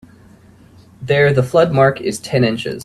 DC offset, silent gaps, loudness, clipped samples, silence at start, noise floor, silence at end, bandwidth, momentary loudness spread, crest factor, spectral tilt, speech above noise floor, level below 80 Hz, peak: under 0.1%; none; -15 LUFS; under 0.1%; 1 s; -45 dBFS; 0 s; 13.5 kHz; 8 LU; 16 dB; -6 dB/octave; 30 dB; -48 dBFS; 0 dBFS